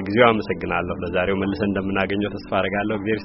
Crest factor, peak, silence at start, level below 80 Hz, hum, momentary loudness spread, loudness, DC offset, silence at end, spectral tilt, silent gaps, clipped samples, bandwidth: 22 dB; 0 dBFS; 0 s; -46 dBFS; none; 7 LU; -22 LUFS; under 0.1%; 0 s; -4.5 dB/octave; none; under 0.1%; 6 kHz